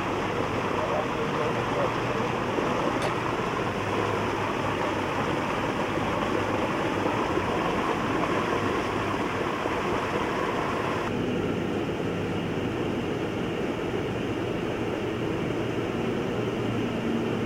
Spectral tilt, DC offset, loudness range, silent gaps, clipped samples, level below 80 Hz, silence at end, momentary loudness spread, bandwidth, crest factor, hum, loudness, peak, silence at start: -6 dB/octave; under 0.1%; 3 LU; none; under 0.1%; -48 dBFS; 0 s; 3 LU; 16.5 kHz; 16 dB; none; -28 LUFS; -12 dBFS; 0 s